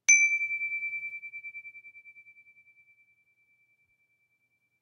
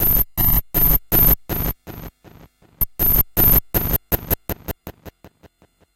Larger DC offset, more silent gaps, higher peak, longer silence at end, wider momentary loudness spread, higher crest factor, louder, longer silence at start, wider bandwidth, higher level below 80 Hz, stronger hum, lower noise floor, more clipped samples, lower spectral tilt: neither; neither; second, -8 dBFS vs -4 dBFS; first, 2.6 s vs 0.85 s; first, 28 LU vs 18 LU; first, 24 dB vs 16 dB; second, -27 LUFS vs -17 LUFS; about the same, 0.1 s vs 0 s; second, 14 kHz vs 17 kHz; second, under -90 dBFS vs -26 dBFS; neither; first, -75 dBFS vs -54 dBFS; neither; second, 4.5 dB/octave vs -5 dB/octave